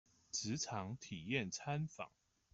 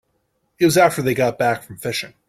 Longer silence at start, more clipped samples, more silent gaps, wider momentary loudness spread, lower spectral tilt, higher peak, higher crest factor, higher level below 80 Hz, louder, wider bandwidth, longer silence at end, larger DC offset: second, 0.35 s vs 0.6 s; neither; neither; second, 8 LU vs 11 LU; about the same, -4 dB/octave vs -4.5 dB/octave; second, -24 dBFS vs -2 dBFS; about the same, 20 dB vs 18 dB; second, -74 dBFS vs -56 dBFS; second, -43 LUFS vs -18 LUFS; second, 8.2 kHz vs 16.5 kHz; first, 0.45 s vs 0.2 s; neither